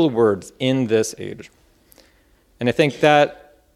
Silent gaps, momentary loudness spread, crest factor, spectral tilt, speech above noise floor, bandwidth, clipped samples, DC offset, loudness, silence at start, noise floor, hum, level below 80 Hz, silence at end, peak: none; 16 LU; 20 dB; -5.5 dB/octave; 39 dB; 14.5 kHz; under 0.1%; under 0.1%; -19 LUFS; 0 s; -57 dBFS; none; -58 dBFS; 0.4 s; 0 dBFS